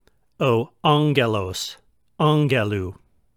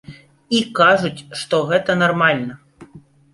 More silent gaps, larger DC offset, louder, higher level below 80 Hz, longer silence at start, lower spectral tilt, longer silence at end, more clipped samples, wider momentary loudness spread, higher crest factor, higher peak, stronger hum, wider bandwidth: neither; neither; second, -21 LUFS vs -17 LUFS; about the same, -56 dBFS vs -56 dBFS; first, 0.4 s vs 0.1 s; about the same, -6 dB/octave vs -5 dB/octave; about the same, 0.45 s vs 0.35 s; neither; about the same, 11 LU vs 11 LU; about the same, 20 dB vs 18 dB; about the same, -2 dBFS vs 0 dBFS; neither; first, 15.5 kHz vs 11.5 kHz